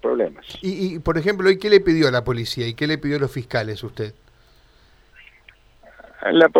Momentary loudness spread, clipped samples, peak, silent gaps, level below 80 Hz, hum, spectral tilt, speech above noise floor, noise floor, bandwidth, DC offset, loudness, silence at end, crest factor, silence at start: 14 LU; under 0.1%; -2 dBFS; none; -46 dBFS; none; -6 dB/octave; 34 dB; -53 dBFS; 14 kHz; under 0.1%; -21 LUFS; 0 s; 20 dB; 0.05 s